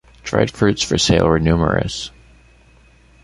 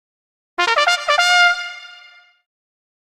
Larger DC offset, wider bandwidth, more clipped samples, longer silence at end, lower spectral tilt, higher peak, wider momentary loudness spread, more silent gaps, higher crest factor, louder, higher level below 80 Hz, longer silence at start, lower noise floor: neither; second, 11.5 kHz vs 15 kHz; neither; about the same, 1.15 s vs 1.15 s; first, -5 dB/octave vs 2.5 dB/octave; about the same, -2 dBFS vs -2 dBFS; second, 11 LU vs 18 LU; neither; about the same, 16 dB vs 18 dB; about the same, -17 LUFS vs -15 LUFS; first, -34 dBFS vs -70 dBFS; second, 0.25 s vs 0.6 s; first, -50 dBFS vs -46 dBFS